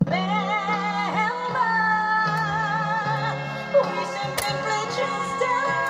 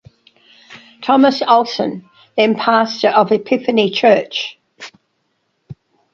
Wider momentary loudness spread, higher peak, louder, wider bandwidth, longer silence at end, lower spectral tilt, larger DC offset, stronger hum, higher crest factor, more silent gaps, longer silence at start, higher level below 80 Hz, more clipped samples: second, 5 LU vs 20 LU; second, -8 dBFS vs 0 dBFS; second, -23 LUFS vs -15 LUFS; first, 15.5 kHz vs 7.6 kHz; second, 0 s vs 0.4 s; about the same, -4.5 dB/octave vs -5 dB/octave; neither; neither; about the same, 16 dB vs 16 dB; neither; second, 0 s vs 0.7 s; about the same, -60 dBFS vs -62 dBFS; neither